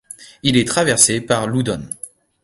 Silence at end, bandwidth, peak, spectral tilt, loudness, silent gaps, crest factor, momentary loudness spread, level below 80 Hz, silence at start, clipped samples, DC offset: 0.35 s; 16 kHz; 0 dBFS; -3.5 dB/octave; -16 LUFS; none; 18 dB; 18 LU; -48 dBFS; 0.2 s; under 0.1%; under 0.1%